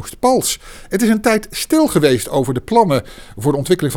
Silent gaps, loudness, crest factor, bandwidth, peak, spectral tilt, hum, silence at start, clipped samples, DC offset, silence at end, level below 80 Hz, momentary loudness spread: none; -16 LUFS; 16 dB; 19 kHz; 0 dBFS; -5 dB/octave; none; 0 s; under 0.1%; under 0.1%; 0 s; -42 dBFS; 7 LU